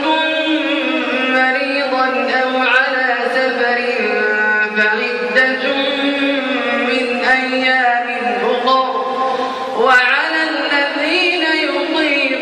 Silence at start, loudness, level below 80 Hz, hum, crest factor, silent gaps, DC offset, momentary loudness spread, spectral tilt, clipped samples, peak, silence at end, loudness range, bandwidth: 0 s; -14 LUFS; -64 dBFS; none; 14 dB; none; under 0.1%; 4 LU; -3 dB/octave; under 0.1%; -2 dBFS; 0 s; 1 LU; 11 kHz